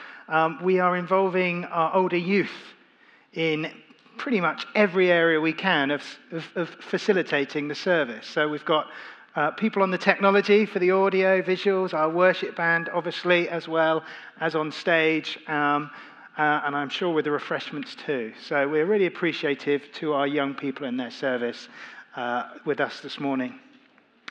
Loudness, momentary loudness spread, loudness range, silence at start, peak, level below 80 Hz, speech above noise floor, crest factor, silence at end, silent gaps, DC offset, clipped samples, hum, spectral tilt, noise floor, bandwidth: -24 LUFS; 12 LU; 6 LU; 0 s; -2 dBFS; -90 dBFS; 35 dB; 24 dB; 0.7 s; none; under 0.1%; under 0.1%; none; -6 dB/octave; -59 dBFS; 8.4 kHz